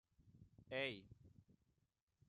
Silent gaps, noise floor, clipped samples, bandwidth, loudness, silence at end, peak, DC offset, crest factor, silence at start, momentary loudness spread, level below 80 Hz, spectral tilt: none; -86 dBFS; under 0.1%; 10.5 kHz; -47 LUFS; 0.75 s; -30 dBFS; under 0.1%; 24 dB; 0.25 s; 23 LU; -80 dBFS; -5.5 dB/octave